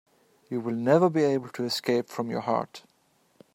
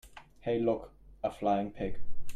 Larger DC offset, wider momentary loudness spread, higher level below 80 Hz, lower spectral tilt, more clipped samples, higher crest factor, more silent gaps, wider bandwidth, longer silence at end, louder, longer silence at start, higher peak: neither; second, 11 LU vs 19 LU; second, -76 dBFS vs -48 dBFS; about the same, -6 dB/octave vs -7 dB/octave; neither; first, 20 dB vs 12 dB; neither; first, 16 kHz vs 12.5 kHz; first, 0.75 s vs 0 s; first, -27 LUFS vs -34 LUFS; first, 0.5 s vs 0.05 s; first, -8 dBFS vs -18 dBFS